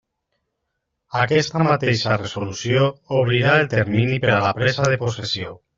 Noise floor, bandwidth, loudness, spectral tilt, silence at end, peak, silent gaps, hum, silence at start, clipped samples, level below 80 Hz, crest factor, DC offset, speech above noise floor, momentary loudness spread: -77 dBFS; 7.6 kHz; -19 LUFS; -4.5 dB/octave; 0.2 s; -2 dBFS; none; none; 1.1 s; under 0.1%; -52 dBFS; 18 dB; under 0.1%; 57 dB; 8 LU